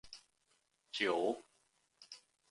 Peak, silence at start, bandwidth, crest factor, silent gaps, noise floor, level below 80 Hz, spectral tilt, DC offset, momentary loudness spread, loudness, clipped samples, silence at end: -20 dBFS; 0.05 s; 11.5 kHz; 22 dB; none; -78 dBFS; -80 dBFS; -3.5 dB/octave; under 0.1%; 22 LU; -38 LUFS; under 0.1%; 0.35 s